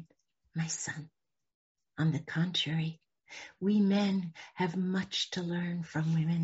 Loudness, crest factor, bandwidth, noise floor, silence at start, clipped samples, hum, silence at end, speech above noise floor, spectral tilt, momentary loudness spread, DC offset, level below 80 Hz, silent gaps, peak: -33 LUFS; 14 dB; 8 kHz; -71 dBFS; 0 s; under 0.1%; none; 0 s; 39 dB; -5 dB/octave; 15 LU; under 0.1%; -72 dBFS; 1.55-1.75 s; -20 dBFS